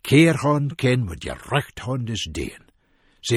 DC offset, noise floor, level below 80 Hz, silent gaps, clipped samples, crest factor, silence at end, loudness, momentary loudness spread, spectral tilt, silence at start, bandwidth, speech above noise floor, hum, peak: under 0.1%; -61 dBFS; -44 dBFS; none; under 0.1%; 18 dB; 0 s; -22 LUFS; 16 LU; -5.5 dB/octave; 0.05 s; 15 kHz; 40 dB; none; -4 dBFS